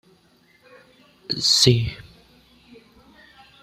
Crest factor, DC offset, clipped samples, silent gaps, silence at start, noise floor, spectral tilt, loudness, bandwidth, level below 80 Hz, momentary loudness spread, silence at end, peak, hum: 24 dB; under 0.1%; under 0.1%; none; 1.3 s; -58 dBFS; -3.5 dB/octave; -18 LUFS; 15.5 kHz; -50 dBFS; 27 LU; 1.6 s; -2 dBFS; none